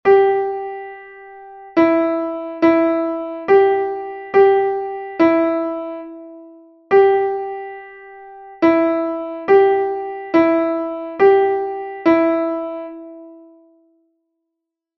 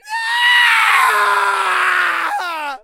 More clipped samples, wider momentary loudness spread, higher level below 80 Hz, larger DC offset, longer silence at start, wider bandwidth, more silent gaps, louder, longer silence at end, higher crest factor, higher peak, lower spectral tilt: neither; first, 22 LU vs 10 LU; first, -58 dBFS vs -66 dBFS; neither; about the same, 0.05 s vs 0.05 s; second, 5.8 kHz vs 16 kHz; neither; second, -17 LUFS vs -13 LUFS; first, 1.6 s vs 0.05 s; about the same, 16 dB vs 14 dB; about the same, -2 dBFS vs 0 dBFS; first, -7.5 dB/octave vs 2 dB/octave